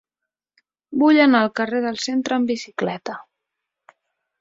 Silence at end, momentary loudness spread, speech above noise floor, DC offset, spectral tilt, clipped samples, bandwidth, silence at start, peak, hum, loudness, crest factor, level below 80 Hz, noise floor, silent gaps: 1.2 s; 16 LU; 66 dB; under 0.1%; -4.5 dB/octave; under 0.1%; 7.8 kHz; 0.9 s; -4 dBFS; none; -19 LUFS; 18 dB; -66 dBFS; -85 dBFS; none